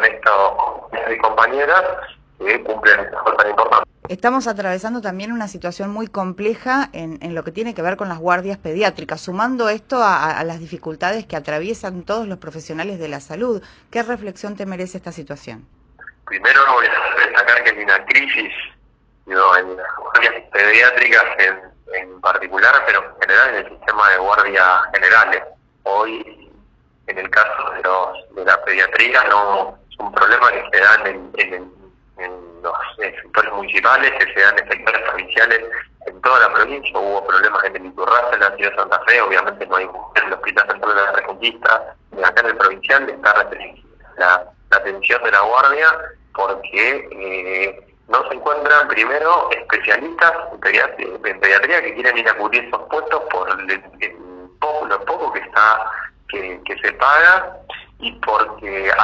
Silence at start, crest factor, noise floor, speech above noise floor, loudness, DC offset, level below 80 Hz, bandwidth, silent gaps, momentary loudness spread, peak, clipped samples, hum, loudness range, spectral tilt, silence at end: 0 s; 16 dB; -54 dBFS; 37 dB; -15 LUFS; under 0.1%; -52 dBFS; 9 kHz; none; 15 LU; 0 dBFS; under 0.1%; none; 8 LU; -4 dB/octave; 0 s